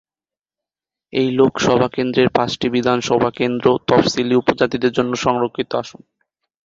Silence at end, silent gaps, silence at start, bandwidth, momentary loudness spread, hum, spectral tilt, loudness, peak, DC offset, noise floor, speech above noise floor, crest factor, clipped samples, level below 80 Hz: 0.75 s; none; 1.15 s; 7.8 kHz; 6 LU; none; -5.5 dB/octave; -17 LUFS; 0 dBFS; under 0.1%; under -90 dBFS; over 73 dB; 18 dB; under 0.1%; -50 dBFS